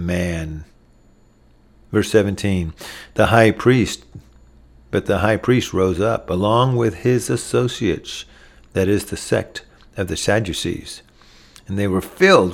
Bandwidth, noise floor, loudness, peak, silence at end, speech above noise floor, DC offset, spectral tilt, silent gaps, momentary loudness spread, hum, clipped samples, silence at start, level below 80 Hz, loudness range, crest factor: 16.5 kHz; -52 dBFS; -19 LUFS; 0 dBFS; 0 s; 34 dB; under 0.1%; -5.5 dB/octave; none; 17 LU; none; under 0.1%; 0 s; -42 dBFS; 5 LU; 20 dB